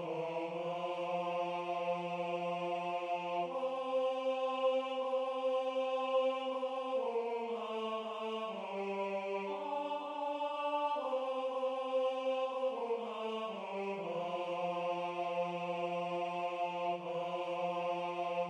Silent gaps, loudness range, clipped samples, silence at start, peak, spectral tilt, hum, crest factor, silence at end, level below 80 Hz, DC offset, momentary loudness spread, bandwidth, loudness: none; 3 LU; under 0.1%; 0 s; -22 dBFS; -5.5 dB/octave; none; 14 dB; 0 s; -90 dBFS; under 0.1%; 5 LU; 9.6 kHz; -37 LUFS